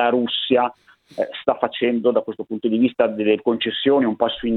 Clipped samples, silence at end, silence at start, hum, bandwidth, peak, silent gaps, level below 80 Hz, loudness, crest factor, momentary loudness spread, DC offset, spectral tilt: under 0.1%; 0 s; 0 s; none; 4.5 kHz; -2 dBFS; none; -56 dBFS; -20 LUFS; 18 dB; 7 LU; under 0.1%; -7.5 dB/octave